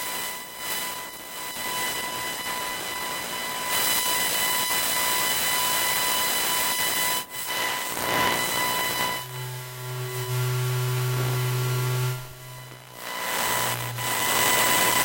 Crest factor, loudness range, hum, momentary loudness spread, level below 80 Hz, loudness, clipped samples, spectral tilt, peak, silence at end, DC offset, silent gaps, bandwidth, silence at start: 20 dB; 6 LU; none; 12 LU; -58 dBFS; -24 LUFS; under 0.1%; -2 dB/octave; -6 dBFS; 0 s; under 0.1%; none; 16.5 kHz; 0 s